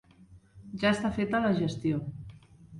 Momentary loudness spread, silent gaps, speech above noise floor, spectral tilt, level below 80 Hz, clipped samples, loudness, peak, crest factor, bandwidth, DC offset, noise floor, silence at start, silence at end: 18 LU; none; 28 dB; -6.5 dB/octave; -56 dBFS; under 0.1%; -29 LUFS; -12 dBFS; 18 dB; 11 kHz; under 0.1%; -56 dBFS; 0.2 s; 0 s